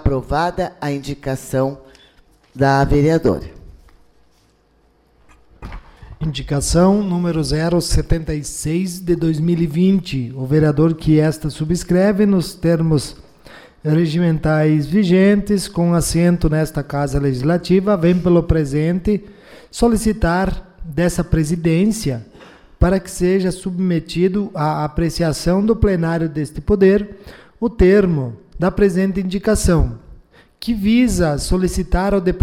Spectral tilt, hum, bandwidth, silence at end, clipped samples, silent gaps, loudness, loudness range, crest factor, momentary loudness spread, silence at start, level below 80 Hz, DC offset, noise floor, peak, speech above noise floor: -6.5 dB/octave; none; 15 kHz; 0 s; under 0.1%; none; -17 LUFS; 4 LU; 14 dB; 10 LU; 0 s; -30 dBFS; under 0.1%; -56 dBFS; -4 dBFS; 40 dB